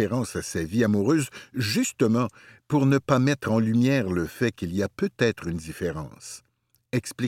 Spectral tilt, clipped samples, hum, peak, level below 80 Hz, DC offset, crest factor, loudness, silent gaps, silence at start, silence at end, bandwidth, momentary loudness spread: -6 dB/octave; under 0.1%; none; -6 dBFS; -54 dBFS; under 0.1%; 18 dB; -25 LUFS; none; 0 s; 0 s; 16.5 kHz; 11 LU